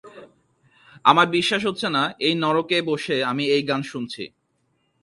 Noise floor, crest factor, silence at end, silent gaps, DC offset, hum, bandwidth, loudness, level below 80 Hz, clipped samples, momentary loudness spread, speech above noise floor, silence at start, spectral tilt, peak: -69 dBFS; 22 dB; 0.75 s; none; under 0.1%; none; 11.5 kHz; -21 LUFS; -66 dBFS; under 0.1%; 14 LU; 48 dB; 0.05 s; -4.5 dB/octave; 0 dBFS